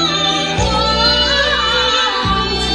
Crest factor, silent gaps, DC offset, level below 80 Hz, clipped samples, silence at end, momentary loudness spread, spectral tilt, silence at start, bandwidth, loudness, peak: 14 dB; none; under 0.1%; -28 dBFS; under 0.1%; 0 s; 4 LU; -3 dB/octave; 0 s; 11 kHz; -13 LUFS; 0 dBFS